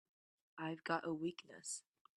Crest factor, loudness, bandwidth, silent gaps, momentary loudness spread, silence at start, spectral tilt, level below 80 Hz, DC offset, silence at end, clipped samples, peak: 24 dB; -45 LUFS; 12 kHz; none; 9 LU; 0.55 s; -4 dB/octave; -88 dBFS; under 0.1%; 0.35 s; under 0.1%; -24 dBFS